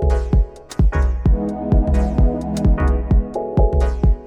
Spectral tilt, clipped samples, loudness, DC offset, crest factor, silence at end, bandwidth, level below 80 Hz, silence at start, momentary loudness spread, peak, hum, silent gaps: -8.5 dB/octave; under 0.1%; -19 LUFS; under 0.1%; 12 dB; 0 s; 8.6 kHz; -18 dBFS; 0 s; 3 LU; -4 dBFS; none; none